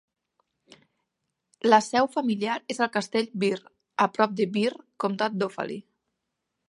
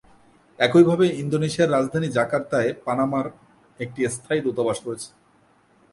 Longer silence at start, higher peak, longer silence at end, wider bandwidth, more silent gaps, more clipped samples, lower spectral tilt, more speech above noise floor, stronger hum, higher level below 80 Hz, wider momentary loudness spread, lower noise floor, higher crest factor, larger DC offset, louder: first, 1.65 s vs 0.6 s; about the same, -4 dBFS vs -2 dBFS; about the same, 0.9 s vs 0.85 s; about the same, 11.5 kHz vs 11.5 kHz; neither; neither; about the same, -5 dB/octave vs -6 dB/octave; first, 56 dB vs 38 dB; neither; second, -76 dBFS vs -60 dBFS; second, 12 LU vs 17 LU; first, -82 dBFS vs -59 dBFS; about the same, 24 dB vs 22 dB; neither; second, -26 LUFS vs -22 LUFS